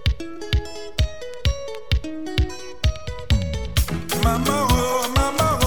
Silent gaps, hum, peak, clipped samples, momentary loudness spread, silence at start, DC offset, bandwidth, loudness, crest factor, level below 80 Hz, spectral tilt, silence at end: none; none; -4 dBFS; under 0.1%; 7 LU; 0.05 s; 2%; over 20 kHz; -23 LUFS; 18 dB; -26 dBFS; -4.5 dB/octave; 0 s